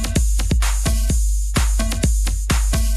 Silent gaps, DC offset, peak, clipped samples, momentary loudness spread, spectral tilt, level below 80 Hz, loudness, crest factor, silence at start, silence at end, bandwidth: none; under 0.1%; -8 dBFS; under 0.1%; 1 LU; -4 dB/octave; -18 dBFS; -20 LUFS; 10 dB; 0 s; 0 s; 13.5 kHz